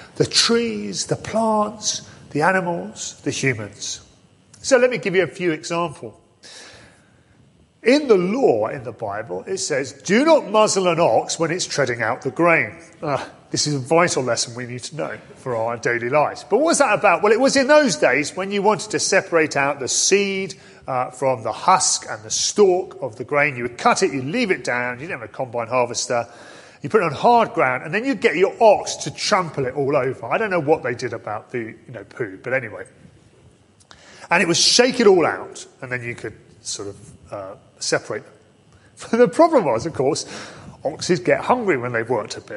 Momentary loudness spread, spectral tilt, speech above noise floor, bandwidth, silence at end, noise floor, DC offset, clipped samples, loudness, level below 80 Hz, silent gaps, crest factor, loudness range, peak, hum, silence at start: 15 LU; -3.5 dB/octave; 34 dB; 11.5 kHz; 0 s; -54 dBFS; under 0.1%; under 0.1%; -19 LUFS; -58 dBFS; none; 20 dB; 6 LU; -2 dBFS; none; 0 s